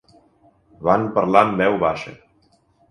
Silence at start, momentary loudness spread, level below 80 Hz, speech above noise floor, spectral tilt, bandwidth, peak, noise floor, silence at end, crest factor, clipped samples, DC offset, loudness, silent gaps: 0.8 s; 12 LU; -54 dBFS; 42 dB; -7 dB/octave; 10.5 kHz; 0 dBFS; -60 dBFS; 0.75 s; 22 dB; under 0.1%; under 0.1%; -19 LUFS; none